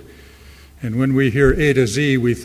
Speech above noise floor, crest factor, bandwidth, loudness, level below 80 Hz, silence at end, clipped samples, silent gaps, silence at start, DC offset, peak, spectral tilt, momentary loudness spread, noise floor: 27 dB; 18 dB; 16 kHz; -16 LUFS; -34 dBFS; 0 s; under 0.1%; none; 0.45 s; under 0.1%; 0 dBFS; -6.5 dB/octave; 8 LU; -43 dBFS